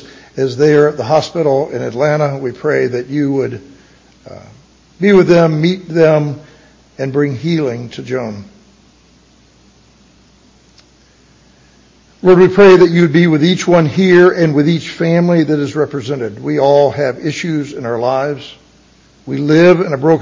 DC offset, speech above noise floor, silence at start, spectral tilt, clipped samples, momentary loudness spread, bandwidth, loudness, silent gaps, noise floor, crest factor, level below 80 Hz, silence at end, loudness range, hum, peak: under 0.1%; 36 dB; 0 s; -7 dB/octave; under 0.1%; 13 LU; 7.6 kHz; -12 LUFS; none; -48 dBFS; 14 dB; -52 dBFS; 0 s; 11 LU; none; 0 dBFS